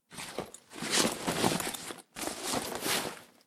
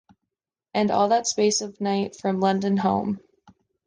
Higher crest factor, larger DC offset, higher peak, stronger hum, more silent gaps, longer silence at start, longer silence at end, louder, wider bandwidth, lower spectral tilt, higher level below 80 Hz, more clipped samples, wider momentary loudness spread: first, 24 dB vs 16 dB; neither; second, -12 dBFS vs -8 dBFS; neither; neither; second, 0.1 s vs 0.75 s; second, 0.2 s vs 0.7 s; second, -32 LUFS vs -23 LUFS; first, 17 kHz vs 10 kHz; second, -2.5 dB/octave vs -4.5 dB/octave; about the same, -62 dBFS vs -62 dBFS; neither; first, 13 LU vs 7 LU